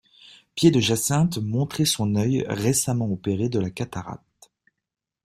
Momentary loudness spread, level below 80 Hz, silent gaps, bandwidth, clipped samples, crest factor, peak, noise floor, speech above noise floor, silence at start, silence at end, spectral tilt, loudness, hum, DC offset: 12 LU; -56 dBFS; none; 16 kHz; under 0.1%; 20 dB; -4 dBFS; -68 dBFS; 45 dB; 0.55 s; 1.1 s; -5 dB/octave; -23 LUFS; none; under 0.1%